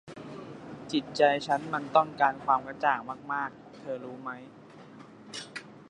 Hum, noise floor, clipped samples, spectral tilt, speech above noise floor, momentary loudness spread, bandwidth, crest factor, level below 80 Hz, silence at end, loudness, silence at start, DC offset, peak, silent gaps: none; -50 dBFS; under 0.1%; -4.5 dB/octave; 21 dB; 20 LU; 11 kHz; 22 dB; -70 dBFS; 0.05 s; -29 LUFS; 0.05 s; under 0.1%; -8 dBFS; none